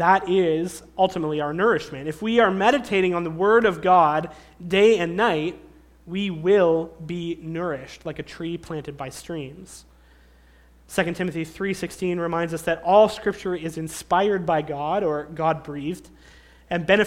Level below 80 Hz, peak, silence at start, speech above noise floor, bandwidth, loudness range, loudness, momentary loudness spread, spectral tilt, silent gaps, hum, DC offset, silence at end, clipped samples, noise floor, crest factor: -52 dBFS; -4 dBFS; 0 s; 31 dB; 15.5 kHz; 12 LU; -23 LUFS; 15 LU; -5.5 dB/octave; none; none; under 0.1%; 0 s; under 0.1%; -53 dBFS; 20 dB